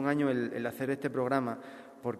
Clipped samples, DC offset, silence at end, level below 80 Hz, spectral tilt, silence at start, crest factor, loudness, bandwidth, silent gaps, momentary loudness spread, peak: under 0.1%; under 0.1%; 0 s; -74 dBFS; -7 dB/octave; 0 s; 18 dB; -32 LUFS; 14 kHz; none; 11 LU; -14 dBFS